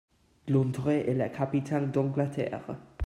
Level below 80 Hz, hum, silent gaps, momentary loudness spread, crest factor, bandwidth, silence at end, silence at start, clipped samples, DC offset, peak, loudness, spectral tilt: -62 dBFS; none; none; 9 LU; 16 dB; 11.5 kHz; 0 s; 0.45 s; under 0.1%; under 0.1%; -14 dBFS; -29 LUFS; -8.5 dB/octave